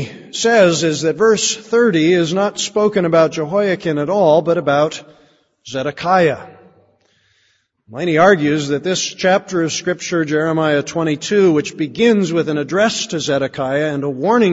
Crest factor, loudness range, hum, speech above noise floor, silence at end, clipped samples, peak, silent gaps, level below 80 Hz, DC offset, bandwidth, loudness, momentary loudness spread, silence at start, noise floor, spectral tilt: 16 dB; 3 LU; none; 46 dB; 0 s; under 0.1%; 0 dBFS; none; -58 dBFS; under 0.1%; 8 kHz; -16 LUFS; 7 LU; 0 s; -61 dBFS; -4.5 dB/octave